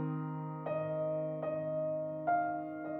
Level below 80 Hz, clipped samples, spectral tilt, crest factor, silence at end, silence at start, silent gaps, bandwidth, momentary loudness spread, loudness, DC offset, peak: -78 dBFS; under 0.1%; -11.5 dB/octave; 14 dB; 0 s; 0 s; none; 3.8 kHz; 6 LU; -36 LUFS; under 0.1%; -22 dBFS